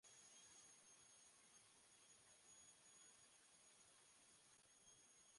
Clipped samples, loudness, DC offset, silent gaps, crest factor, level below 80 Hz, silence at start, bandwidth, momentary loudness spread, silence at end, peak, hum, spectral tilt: under 0.1%; -68 LUFS; under 0.1%; none; 14 dB; under -90 dBFS; 0.05 s; 11.5 kHz; 4 LU; 0 s; -56 dBFS; none; 0 dB/octave